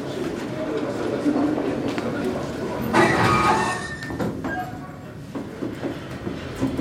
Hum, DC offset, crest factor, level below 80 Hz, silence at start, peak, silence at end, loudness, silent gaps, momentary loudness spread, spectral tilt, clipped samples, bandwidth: none; under 0.1%; 18 dB; -48 dBFS; 0 s; -6 dBFS; 0 s; -24 LUFS; none; 15 LU; -5.5 dB/octave; under 0.1%; 16 kHz